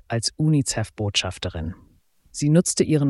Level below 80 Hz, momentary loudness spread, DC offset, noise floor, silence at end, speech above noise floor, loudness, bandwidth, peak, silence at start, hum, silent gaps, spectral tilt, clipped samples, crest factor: -46 dBFS; 13 LU; under 0.1%; -52 dBFS; 0 s; 30 dB; -22 LUFS; 12 kHz; -6 dBFS; 0.1 s; none; none; -5 dB/octave; under 0.1%; 16 dB